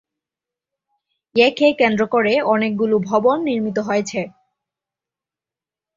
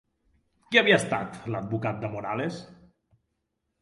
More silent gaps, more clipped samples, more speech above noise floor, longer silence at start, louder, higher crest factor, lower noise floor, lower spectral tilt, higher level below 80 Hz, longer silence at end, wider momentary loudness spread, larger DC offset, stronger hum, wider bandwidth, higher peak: neither; neither; first, 72 dB vs 53 dB; first, 1.35 s vs 0.7 s; first, -18 LUFS vs -26 LUFS; second, 18 dB vs 26 dB; first, -89 dBFS vs -79 dBFS; about the same, -5 dB/octave vs -4.5 dB/octave; about the same, -62 dBFS vs -64 dBFS; first, 1.7 s vs 1.05 s; second, 8 LU vs 14 LU; neither; neither; second, 7.6 kHz vs 11.5 kHz; about the same, -2 dBFS vs -4 dBFS